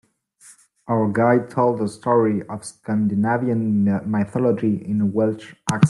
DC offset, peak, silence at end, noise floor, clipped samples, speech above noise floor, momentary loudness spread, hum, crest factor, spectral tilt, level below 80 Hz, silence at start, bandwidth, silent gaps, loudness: under 0.1%; 0 dBFS; 0 s; -51 dBFS; under 0.1%; 31 dB; 7 LU; none; 20 dB; -7.5 dB/octave; -60 dBFS; 0.85 s; 12 kHz; none; -21 LUFS